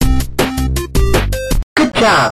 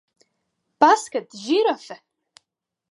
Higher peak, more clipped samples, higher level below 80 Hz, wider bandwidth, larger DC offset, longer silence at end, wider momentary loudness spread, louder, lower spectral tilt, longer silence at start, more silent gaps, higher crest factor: about the same, 0 dBFS vs -2 dBFS; neither; first, -18 dBFS vs -76 dBFS; first, 15 kHz vs 11.5 kHz; neither; second, 0.05 s vs 0.95 s; second, 7 LU vs 20 LU; first, -15 LUFS vs -20 LUFS; first, -5 dB/octave vs -2.5 dB/octave; second, 0 s vs 0.8 s; first, 1.63-1.76 s vs none; second, 14 dB vs 22 dB